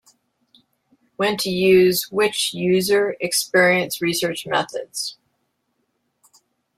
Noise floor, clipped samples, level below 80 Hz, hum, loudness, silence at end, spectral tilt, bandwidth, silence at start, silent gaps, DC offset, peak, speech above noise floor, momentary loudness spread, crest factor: -72 dBFS; under 0.1%; -62 dBFS; none; -19 LUFS; 1.65 s; -3.5 dB/octave; 16 kHz; 1.2 s; none; under 0.1%; -4 dBFS; 52 dB; 11 LU; 18 dB